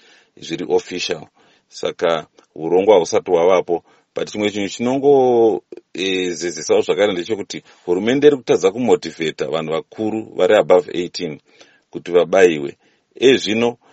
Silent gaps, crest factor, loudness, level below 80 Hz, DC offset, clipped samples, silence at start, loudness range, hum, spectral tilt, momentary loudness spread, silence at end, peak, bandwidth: none; 18 dB; -17 LUFS; -62 dBFS; under 0.1%; under 0.1%; 0.4 s; 2 LU; none; -4.5 dB/octave; 15 LU; 0.2 s; 0 dBFS; 8.4 kHz